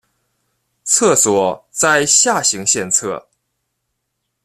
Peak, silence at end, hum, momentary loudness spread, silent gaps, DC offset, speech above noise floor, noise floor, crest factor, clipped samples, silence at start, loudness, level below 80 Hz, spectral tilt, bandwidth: 0 dBFS; 1.25 s; none; 12 LU; none; under 0.1%; 58 dB; -73 dBFS; 18 dB; under 0.1%; 0.85 s; -13 LUFS; -60 dBFS; -1.5 dB/octave; 15 kHz